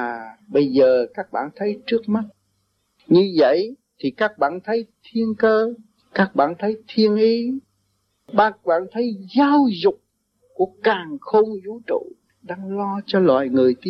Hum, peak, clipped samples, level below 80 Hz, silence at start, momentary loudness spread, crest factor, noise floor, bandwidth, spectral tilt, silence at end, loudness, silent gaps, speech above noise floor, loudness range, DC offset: none; -4 dBFS; under 0.1%; -66 dBFS; 0 s; 12 LU; 16 dB; -69 dBFS; 6 kHz; -8 dB/octave; 0 s; -20 LUFS; none; 50 dB; 2 LU; under 0.1%